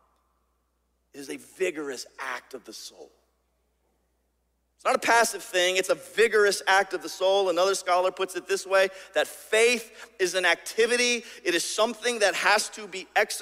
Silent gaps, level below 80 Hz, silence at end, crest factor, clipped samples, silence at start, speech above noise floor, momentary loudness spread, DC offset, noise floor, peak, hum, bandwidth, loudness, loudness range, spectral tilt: none; -72 dBFS; 0 s; 18 dB; under 0.1%; 1.15 s; 47 dB; 16 LU; under 0.1%; -73 dBFS; -8 dBFS; none; 16 kHz; -25 LUFS; 13 LU; -1 dB/octave